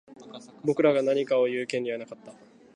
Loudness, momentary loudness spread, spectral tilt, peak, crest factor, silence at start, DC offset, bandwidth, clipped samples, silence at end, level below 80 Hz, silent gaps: -26 LUFS; 23 LU; -5.5 dB/octave; -8 dBFS; 20 dB; 0.1 s; under 0.1%; 10.5 kHz; under 0.1%; 0.45 s; -80 dBFS; none